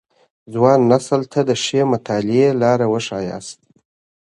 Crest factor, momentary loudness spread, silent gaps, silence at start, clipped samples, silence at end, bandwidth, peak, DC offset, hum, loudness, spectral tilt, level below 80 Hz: 18 dB; 13 LU; none; 0.5 s; under 0.1%; 0.8 s; 11.5 kHz; 0 dBFS; under 0.1%; none; -17 LUFS; -6 dB/octave; -58 dBFS